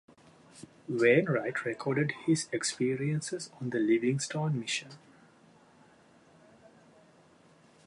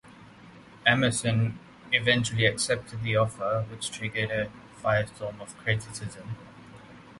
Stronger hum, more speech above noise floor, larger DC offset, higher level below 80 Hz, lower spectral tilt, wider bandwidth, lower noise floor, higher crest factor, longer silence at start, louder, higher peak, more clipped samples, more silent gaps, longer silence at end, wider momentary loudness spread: neither; first, 31 dB vs 23 dB; neither; second, -76 dBFS vs -56 dBFS; about the same, -5 dB/octave vs -4 dB/octave; about the same, 11.5 kHz vs 11.5 kHz; first, -61 dBFS vs -50 dBFS; about the same, 20 dB vs 24 dB; first, 0.55 s vs 0.05 s; second, -30 LUFS vs -27 LUFS; second, -12 dBFS vs -6 dBFS; neither; neither; first, 2.9 s vs 0 s; about the same, 13 LU vs 15 LU